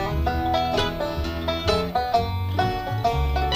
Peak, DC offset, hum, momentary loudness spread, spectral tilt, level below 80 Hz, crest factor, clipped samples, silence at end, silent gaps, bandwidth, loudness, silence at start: -6 dBFS; under 0.1%; none; 4 LU; -6 dB/octave; -30 dBFS; 16 dB; under 0.1%; 0 s; none; 16 kHz; -24 LUFS; 0 s